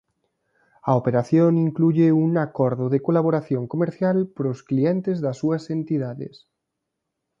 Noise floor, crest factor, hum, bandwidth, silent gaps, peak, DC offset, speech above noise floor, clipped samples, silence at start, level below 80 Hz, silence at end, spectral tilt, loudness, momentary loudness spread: -80 dBFS; 18 dB; none; 7.4 kHz; none; -4 dBFS; under 0.1%; 60 dB; under 0.1%; 0.85 s; -66 dBFS; 1.1 s; -9.5 dB/octave; -22 LUFS; 8 LU